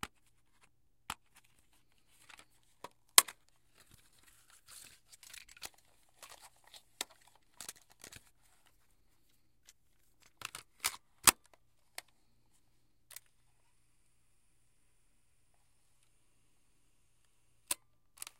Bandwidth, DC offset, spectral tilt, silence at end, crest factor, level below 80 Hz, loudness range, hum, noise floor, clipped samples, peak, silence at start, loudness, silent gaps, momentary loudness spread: 16.5 kHz; under 0.1%; 1 dB/octave; 0.65 s; 42 dB; -70 dBFS; 21 LU; none; -76 dBFS; under 0.1%; 0 dBFS; 0.05 s; -31 LUFS; none; 29 LU